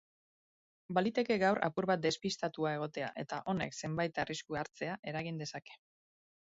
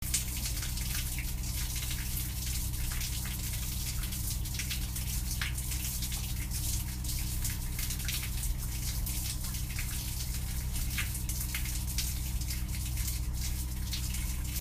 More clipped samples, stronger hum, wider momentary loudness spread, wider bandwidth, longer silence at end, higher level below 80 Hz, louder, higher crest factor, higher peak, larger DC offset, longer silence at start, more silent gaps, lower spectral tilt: neither; neither; first, 10 LU vs 2 LU; second, 7.6 kHz vs 15.5 kHz; first, 0.75 s vs 0 s; second, -70 dBFS vs -36 dBFS; about the same, -36 LUFS vs -35 LUFS; about the same, 20 dB vs 20 dB; about the same, -16 dBFS vs -14 dBFS; neither; first, 0.9 s vs 0 s; first, 4.99-5.03 s vs none; first, -4 dB/octave vs -2.5 dB/octave